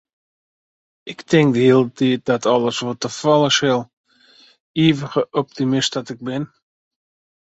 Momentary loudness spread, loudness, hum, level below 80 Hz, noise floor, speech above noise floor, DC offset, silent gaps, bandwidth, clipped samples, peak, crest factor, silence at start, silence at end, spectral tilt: 13 LU; -18 LUFS; none; -60 dBFS; -52 dBFS; 34 dB; under 0.1%; 3.93-4.04 s, 4.60-4.74 s; 8.2 kHz; under 0.1%; 0 dBFS; 18 dB; 1.05 s; 1.1 s; -5 dB/octave